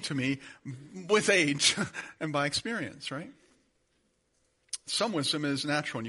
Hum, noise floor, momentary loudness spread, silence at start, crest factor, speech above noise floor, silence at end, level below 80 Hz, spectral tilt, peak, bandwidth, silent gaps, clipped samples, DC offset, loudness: none; -73 dBFS; 18 LU; 0 s; 22 dB; 43 dB; 0 s; -70 dBFS; -3 dB/octave; -8 dBFS; 11.5 kHz; none; under 0.1%; under 0.1%; -29 LUFS